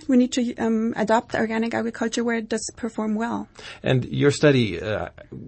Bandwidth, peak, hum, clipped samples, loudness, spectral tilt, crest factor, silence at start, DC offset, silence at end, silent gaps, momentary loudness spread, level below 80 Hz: 8.8 kHz; -6 dBFS; none; under 0.1%; -23 LUFS; -5.5 dB/octave; 16 dB; 0 s; under 0.1%; 0 s; none; 11 LU; -52 dBFS